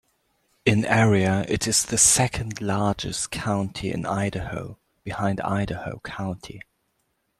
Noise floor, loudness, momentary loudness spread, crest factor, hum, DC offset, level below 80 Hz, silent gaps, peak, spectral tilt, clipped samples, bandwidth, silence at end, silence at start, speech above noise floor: -73 dBFS; -23 LUFS; 18 LU; 20 dB; none; under 0.1%; -48 dBFS; none; -4 dBFS; -4 dB/octave; under 0.1%; 13.5 kHz; 0.8 s; 0.65 s; 49 dB